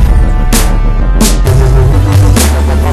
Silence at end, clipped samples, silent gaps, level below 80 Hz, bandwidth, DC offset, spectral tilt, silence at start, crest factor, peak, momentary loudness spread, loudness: 0 s; 2%; none; -8 dBFS; 14 kHz; under 0.1%; -5.5 dB/octave; 0 s; 6 dB; 0 dBFS; 4 LU; -9 LUFS